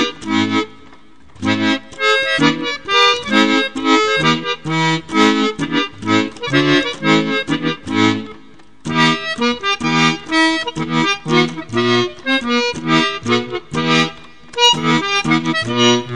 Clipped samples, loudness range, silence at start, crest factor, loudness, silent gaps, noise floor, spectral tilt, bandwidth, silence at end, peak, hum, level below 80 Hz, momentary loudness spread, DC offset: under 0.1%; 2 LU; 0 s; 16 dB; -15 LUFS; none; -45 dBFS; -4 dB/octave; 10 kHz; 0 s; 0 dBFS; none; -50 dBFS; 7 LU; 1%